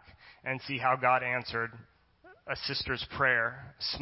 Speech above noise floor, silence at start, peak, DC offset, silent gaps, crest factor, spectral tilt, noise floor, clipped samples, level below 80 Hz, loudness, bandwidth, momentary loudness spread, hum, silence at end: 28 dB; 0.1 s; -12 dBFS; under 0.1%; none; 20 dB; -7.5 dB/octave; -59 dBFS; under 0.1%; -58 dBFS; -31 LUFS; 5.8 kHz; 12 LU; none; 0 s